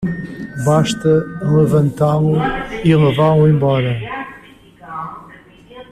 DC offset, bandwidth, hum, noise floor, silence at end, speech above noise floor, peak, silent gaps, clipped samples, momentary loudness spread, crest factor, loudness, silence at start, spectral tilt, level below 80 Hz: under 0.1%; 10.5 kHz; none; -42 dBFS; 0.1 s; 28 dB; -2 dBFS; none; under 0.1%; 16 LU; 14 dB; -15 LUFS; 0 s; -7.5 dB/octave; -42 dBFS